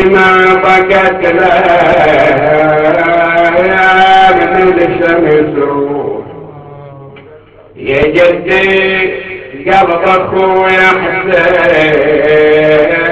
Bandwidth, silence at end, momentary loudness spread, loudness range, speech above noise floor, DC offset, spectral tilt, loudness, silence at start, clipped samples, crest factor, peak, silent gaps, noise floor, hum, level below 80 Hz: 8.2 kHz; 0 s; 8 LU; 6 LU; 28 dB; under 0.1%; -6.5 dB/octave; -7 LUFS; 0 s; under 0.1%; 8 dB; 0 dBFS; none; -36 dBFS; none; -36 dBFS